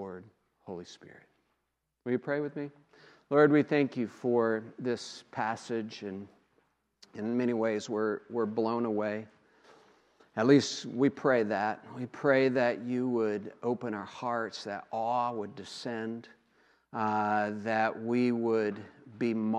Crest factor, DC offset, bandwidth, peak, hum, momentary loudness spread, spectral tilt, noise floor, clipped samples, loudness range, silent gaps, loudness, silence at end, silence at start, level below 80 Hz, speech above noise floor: 22 dB; under 0.1%; 9.8 kHz; -10 dBFS; none; 16 LU; -6 dB/octave; -82 dBFS; under 0.1%; 6 LU; none; -31 LUFS; 0 s; 0 s; -82 dBFS; 51 dB